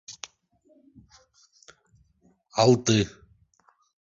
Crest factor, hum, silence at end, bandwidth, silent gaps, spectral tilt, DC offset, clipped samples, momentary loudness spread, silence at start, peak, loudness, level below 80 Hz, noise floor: 22 dB; none; 1 s; 8 kHz; none; -5 dB/octave; under 0.1%; under 0.1%; 22 LU; 0.1 s; -6 dBFS; -23 LUFS; -58 dBFS; -65 dBFS